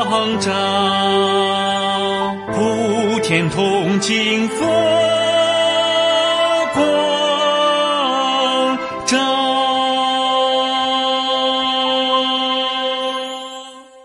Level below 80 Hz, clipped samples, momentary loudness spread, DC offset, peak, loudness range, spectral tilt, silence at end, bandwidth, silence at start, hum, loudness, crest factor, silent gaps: -56 dBFS; under 0.1%; 5 LU; under 0.1%; -4 dBFS; 2 LU; -3.5 dB/octave; 0.05 s; 11.5 kHz; 0 s; none; -16 LUFS; 14 dB; none